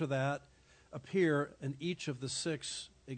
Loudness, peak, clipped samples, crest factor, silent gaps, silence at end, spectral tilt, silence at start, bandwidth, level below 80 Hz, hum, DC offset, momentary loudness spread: -37 LUFS; -20 dBFS; under 0.1%; 18 dB; none; 0 s; -5 dB/octave; 0 s; 9.4 kHz; -70 dBFS; none; under 0.1%; 12 LU